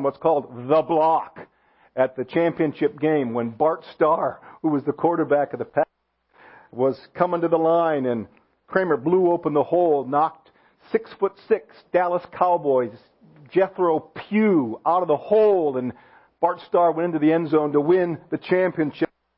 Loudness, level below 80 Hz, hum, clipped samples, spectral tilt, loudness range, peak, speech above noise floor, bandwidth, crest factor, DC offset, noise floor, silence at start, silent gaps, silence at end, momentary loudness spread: -22 LUFS; -66 dBFS; none; under 0.1%; -11.5 dB/octave; 3 LU; -2 dBFS; 43 dB; 5.6 kHz; 18 dB; under 0.1%; -64 dBFS; 0 s; none; 0.3 s; 8 LU